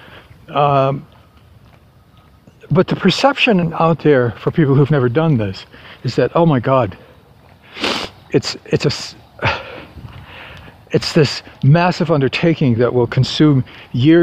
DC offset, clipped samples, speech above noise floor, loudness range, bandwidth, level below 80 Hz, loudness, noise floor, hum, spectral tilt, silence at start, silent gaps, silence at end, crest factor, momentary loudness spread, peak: under 0.1%; under 0.1%; 33 dB; 7 LU; 9.8 kHz; -46 dBFS; -15 LUFS; -47 dBFS; none; -6.5 dB/octave; 0.1 s; none; 0 s; 16 dB; 18 LU; 0 dBFS